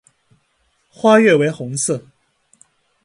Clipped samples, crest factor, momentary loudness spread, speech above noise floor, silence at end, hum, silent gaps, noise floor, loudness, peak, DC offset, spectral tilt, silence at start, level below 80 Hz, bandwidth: under 0.1%; 18 dB; 10 LU; 50 dB; 1.05 s; none; none; -64 dBFS; -15 LUFS; 0 dBFS; under 0.1%; -4.5 dB/octave; 1.05 s; -64 dBFS; 11.5 kHz